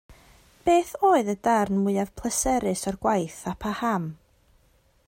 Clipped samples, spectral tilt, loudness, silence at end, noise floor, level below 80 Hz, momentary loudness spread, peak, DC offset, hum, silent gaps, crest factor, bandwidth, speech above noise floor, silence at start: under 0.1%; -5 dB/octave; -25 LUFS; 0.95 s; -63 dBFS; -50 dBFS; 9 LU; -10 dBFS; under 0.1%; none; none; 16 dB; 16.5 kHz; 39 dB; 0.1 s